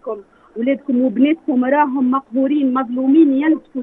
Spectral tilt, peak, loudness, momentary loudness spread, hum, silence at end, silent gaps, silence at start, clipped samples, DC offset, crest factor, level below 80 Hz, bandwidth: -9 dB/octave; -4 dBFS; -16 LUFS; 9 LU; none; 0 s; none; 0.05 s; under 0.1%; under 0.1%; 12 dB; -64 dBFS; 3.8 kHz